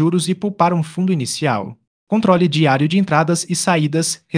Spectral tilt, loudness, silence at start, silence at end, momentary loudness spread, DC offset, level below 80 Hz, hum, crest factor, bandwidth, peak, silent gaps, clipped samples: -5 dB/octave; -17 LUFS; 0 s; 0 s; 6 LU; under 0.1%; -60 dBFS; none; 16 dB; 10.5 kHz; 0 dBFS; 1.87-2.07 s; under 0.1%